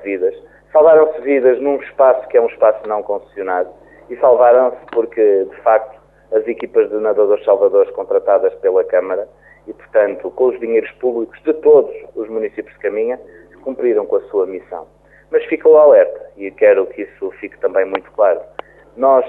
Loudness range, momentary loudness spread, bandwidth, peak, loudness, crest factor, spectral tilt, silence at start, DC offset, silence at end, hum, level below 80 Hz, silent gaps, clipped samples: 4 LU; 15 LU; 3.8 kHz; -2 dBFS; -15 LUFS; 14 dB; -8.5 dB/octave; 0 s; under 0.1%; 0 s; none; -56 dBFS; none; under 0.1%